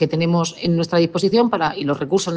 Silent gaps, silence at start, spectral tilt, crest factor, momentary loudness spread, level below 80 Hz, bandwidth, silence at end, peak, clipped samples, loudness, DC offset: none; 0 s; -5.5 dB/octave; 14 dB; 4 LU; -56 dBFS; 10 kHz; 0 s; -4 dBFS; under 0.1%; -19 LUFS; under 0.1%